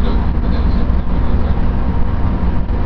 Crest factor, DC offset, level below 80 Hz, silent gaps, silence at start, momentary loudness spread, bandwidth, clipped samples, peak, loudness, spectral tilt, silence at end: 12 dB; under 0.1%; -16 dBFS; none; 0 s; 2 LU; 5.4 kHz; under 0.1%; -2 dBFS; -18 LUFS; -10 dB/octave; 0 s